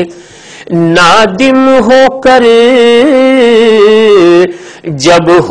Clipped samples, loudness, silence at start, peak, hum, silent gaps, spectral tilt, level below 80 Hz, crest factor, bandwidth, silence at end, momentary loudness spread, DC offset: 6%; -5 LUFS; 0 s; 0 dBFS; none; none; -5 dB/octave; -40 dBFS; 6 dB; 11 kHz; 0 s; 8 LU; under 0.1%